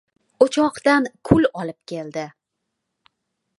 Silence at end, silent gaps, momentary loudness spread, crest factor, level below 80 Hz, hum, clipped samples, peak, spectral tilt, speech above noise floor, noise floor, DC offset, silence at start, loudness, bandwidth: 1.3 s; none; 14 LU; 22 dB; -50 dBFS; none; under 0.1%; 0 dBFS; -6 dB/octave; 59 dB; -79 dBFS; under 0.1%; 0.4 s; -20 LUFS; 11.5 kHz